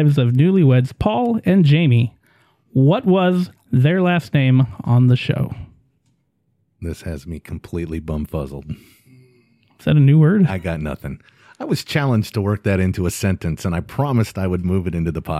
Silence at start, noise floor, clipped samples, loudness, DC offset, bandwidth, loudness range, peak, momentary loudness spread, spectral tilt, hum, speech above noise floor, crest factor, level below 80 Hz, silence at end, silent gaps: 0 s; -66 dBFS; under 0.1%; -18 LUFS; under 0.1%; 14.5 kHz; 13 LU; -4 dBFS; 16 LU; -7.5 dB/octave; none; 49 dB; 14 dB; -40 dBFS; 0 s; none